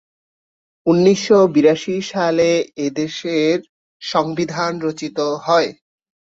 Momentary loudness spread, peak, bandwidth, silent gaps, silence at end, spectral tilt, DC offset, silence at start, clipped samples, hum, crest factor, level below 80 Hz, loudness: 10 LU; -2 dBFS; 7.8 kHz; 3.69-4.00 s; 0.45 s; -5.5 dB/octave; under 0.1%; 0.85 s; under 0.1%; none; 16 dB; -60 dBFS; -17 LUFS